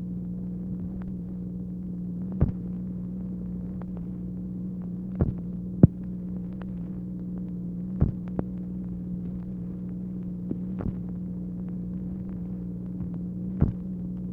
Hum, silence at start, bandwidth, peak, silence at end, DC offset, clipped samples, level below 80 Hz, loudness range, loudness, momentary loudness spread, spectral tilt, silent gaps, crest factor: 60 Hz at -45 dBFS; 0 s; 2.6 kHz; -2 dBFS; 0 s; under 0.1%; under 0.1%; -42 dBFS; 5 LU; -32 LUFS; 7 LU; -12.5 dB/octave; none; 30 dB